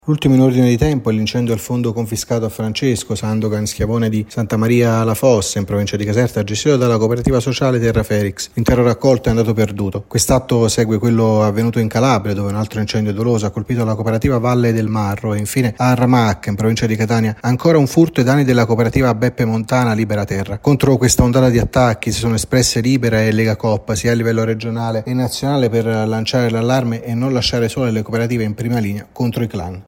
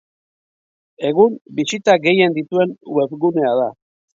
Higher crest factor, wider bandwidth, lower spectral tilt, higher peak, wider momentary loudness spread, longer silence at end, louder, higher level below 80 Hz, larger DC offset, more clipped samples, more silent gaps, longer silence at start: about the same, 14 dB vs 18 dB; first, 16.5 kHz vs 7.8 kHz; about the same, -6 dB/octave vs -5.5 dB/octave; about the same, 0 dBFS vs 0 dBFS; about the same, 7 LU vs 8 LU; second, 0.05 s vs 0.4 s; about the same, -16 LUFS vs -17 LUFS; first, -36 dBFS vs -66 dBFS; neither; neither; second, none vs 1.41-1.45 s; second, 0.05 s vs 1 s